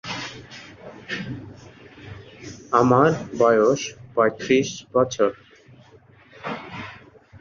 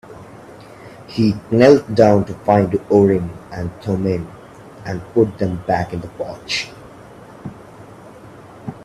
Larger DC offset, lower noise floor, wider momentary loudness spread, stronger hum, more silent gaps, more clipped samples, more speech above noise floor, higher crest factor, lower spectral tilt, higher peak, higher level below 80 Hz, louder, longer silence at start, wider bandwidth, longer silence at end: neither; first, -51 dBFS vs -40 dBFS; about the same, 24 LU vs 23 LU; neither; neither; neither; first, 32 dB vs 23 dB; about the same, 20 dB vs 18 dB; second, -5.5 dB/octave vs -7 dB/octave; about the same, -2 dBFS vs 0 dBFS; second, -58 dBFS vs -48 dBFS; second, -21 LUFS vs -17 LUFS; about the same, 0.05 s vs 0.1 s; second, 7.4 kHz vs 13 kHz; about the same, 0.05 s vs 0 s